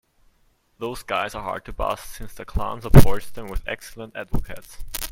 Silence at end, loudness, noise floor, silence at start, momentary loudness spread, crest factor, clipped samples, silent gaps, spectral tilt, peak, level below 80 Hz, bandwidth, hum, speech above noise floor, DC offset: 0.05 s; -24 LUFS; -63 dBFS; 0.8 s; 20 LU; 20 dB; under 0.1%; none; -6 dB/octave; 0 dBFS; -28 dBFS; 17 kHz; none; 44 dB; under 0.1%